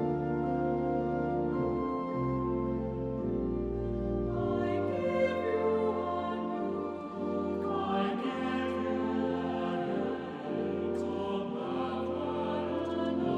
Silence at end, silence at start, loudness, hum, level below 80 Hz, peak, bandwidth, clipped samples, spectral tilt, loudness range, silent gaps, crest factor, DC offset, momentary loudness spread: 0 s; 0 s; -33 LUFS; none; -50 dBFS; -18 dBFS; 8.2 kHz; under 0.1%; -8.5 dB/octave; 2 LU; none; 14 dB; under 0.1%; 4 LU